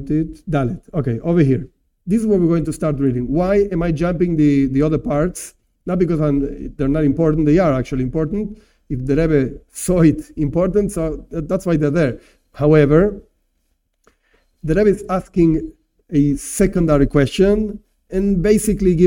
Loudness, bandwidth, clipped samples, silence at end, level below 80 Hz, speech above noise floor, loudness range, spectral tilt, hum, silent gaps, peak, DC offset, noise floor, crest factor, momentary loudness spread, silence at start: -17 LUFS; 17 kHz; under 0.1%; 0 s; -32 dBFS; 50 dB; 2 LU; -7.5 dB/octave; none; none; 0 dBFS; under 0.1%; -67 dBFS; 16 dB; 11 LU; 0 s